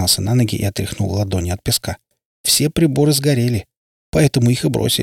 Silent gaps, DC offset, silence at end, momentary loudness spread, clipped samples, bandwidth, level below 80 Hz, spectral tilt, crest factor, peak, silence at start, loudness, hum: 2.25-2.44 s, 3.77-4.13 s; under 0.1%; 0 s; 8 LU; under 0.1%; 18 kHz; -40 dBFS; -4.5 dB/octave; 14 dB; -2 dBFS; 0 s; -17 LUFS; none